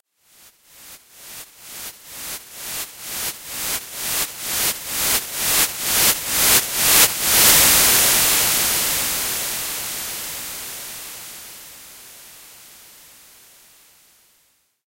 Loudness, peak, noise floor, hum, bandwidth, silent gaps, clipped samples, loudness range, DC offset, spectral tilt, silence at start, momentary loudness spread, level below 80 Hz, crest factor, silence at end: -16 LUFS; 0 dBFS; -62 dBFS; none; 16.5 kHz; none; under 0.1%; 19 LU; under 0.1%; 0.5 dB/octave; 0.8 s; 23 LU; -46 dBFS; 22 dB; 2.25 s